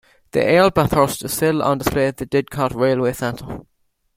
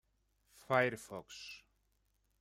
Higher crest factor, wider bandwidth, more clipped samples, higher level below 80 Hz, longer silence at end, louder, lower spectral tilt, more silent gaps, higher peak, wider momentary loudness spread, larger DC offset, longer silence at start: second, 18 dB vs 24 dB; about the same, 16.5 kHz vs 16 kHz; neither; first, -42 dBFS vs -76 dBFS; second, 0.55 s vs 0.85 s; first, -18 LUFS vs -36 LUFS; about the same, -5.5 dB/octave vs -5 dB/octave; neither; first, -2 dBFS vs -16 dBFS; second, 11 LU vs 18 LU; neither; second, 0.35 s vs 0.7 s